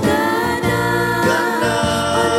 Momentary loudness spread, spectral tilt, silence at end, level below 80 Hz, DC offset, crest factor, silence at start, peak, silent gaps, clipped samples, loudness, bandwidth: 2 LU; -4.5 dB/octave; 0 s; -42 dBFS; under 0.1%; 12 dB; 0 s; -4 dBFS; none; under 0.1%; -17 LUFS; 16.5 kHz